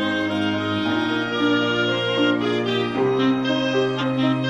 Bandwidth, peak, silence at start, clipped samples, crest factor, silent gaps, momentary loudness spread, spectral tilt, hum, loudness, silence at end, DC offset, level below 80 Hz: 9.6 kHz; -8 dBFS; 0 s; under 0.1%; 14 dB; none; 3 LU; -6 dB/octave; none; -21 LUFS; 0 s; 0.1%; -58 dBFS